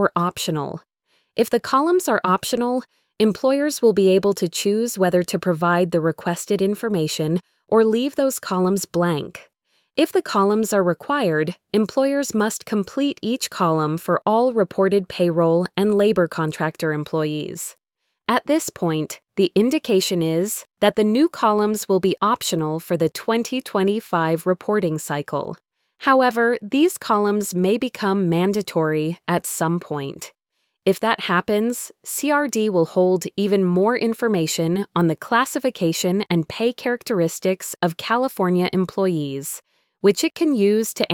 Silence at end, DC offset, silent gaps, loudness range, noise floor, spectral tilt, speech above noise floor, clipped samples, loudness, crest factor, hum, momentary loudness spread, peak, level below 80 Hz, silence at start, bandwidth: 0 s; under 0.1%; none; 3 LU; -74 dBFS; -5 dB/octave; 54 dB; under 0.1%; -21 LUFS; 18 dB; none; 7 LU; -2 dBFS; -62 dBFS; 0 s; 19 kHz